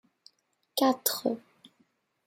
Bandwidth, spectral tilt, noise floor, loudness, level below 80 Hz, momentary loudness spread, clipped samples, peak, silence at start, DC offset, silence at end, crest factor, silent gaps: 16.5 kHz; -2.5 dB/octave; -73 dBFS; -29 LUFS; -84 dBFS; 11 LU; under 0.1%; -10 dBFS; 0.75 s; under 0.1%; 0.85 s; 22 dB; none